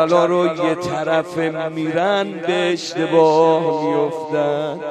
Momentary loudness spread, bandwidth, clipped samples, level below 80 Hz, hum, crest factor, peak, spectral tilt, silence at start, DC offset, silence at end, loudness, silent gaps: 8 LU; 11 kHz; under 0.1%; -64 dBFS; none; 16 dB; -2 dBFS; -5.5 dB/octave; 0 s; under 0.1%; 0 s; -18 LUFS; none